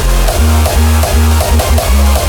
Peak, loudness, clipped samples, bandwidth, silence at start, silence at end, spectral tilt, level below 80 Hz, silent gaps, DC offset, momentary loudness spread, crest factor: 0 dBFS; -10 LUFS; under 0.1%; over 20 kHz; 0 s; 0 s; -5 dB/octave; -12 dBFS; none; under 0.1%; 1 LU; 8 dB